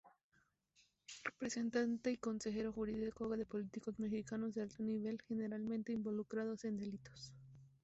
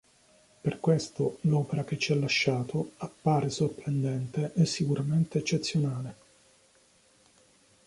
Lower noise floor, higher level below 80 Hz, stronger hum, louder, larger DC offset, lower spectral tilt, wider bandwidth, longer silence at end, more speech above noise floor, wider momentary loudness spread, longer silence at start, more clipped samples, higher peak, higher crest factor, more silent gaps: first, -79 dBFS vs -63 dBFS; second, -72 dBFS vs -64 dBFS; neither; second, -43 LUFS vs -29 LUFS; neither; about the same, -5.5 dB/octave vs -6 dB/octave; second, 8 kHz vs 11.5 kHz; second, 0.15 s vs 1.75 s; about the same, 37 dB vs 35 dB; first, 13 LU vs 7 LU; second, 0.05 s vs 0.65 s; neither; second, -28 dBFS vs -12 dBFS; about the same, 16 dB vs 18 dB; first, 0.24-0.30 s vs none